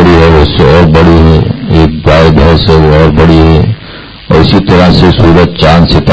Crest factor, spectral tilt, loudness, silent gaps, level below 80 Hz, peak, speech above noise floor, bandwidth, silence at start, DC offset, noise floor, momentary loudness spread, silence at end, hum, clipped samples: 4 dB; -8 dB/octave; -4 LUFS; none; -12 dBFS; 0 dBFS; 22 dB; 8 kHz; 0 s; 2%; -25 dBFS; 5 LU; 0 s; none; 10%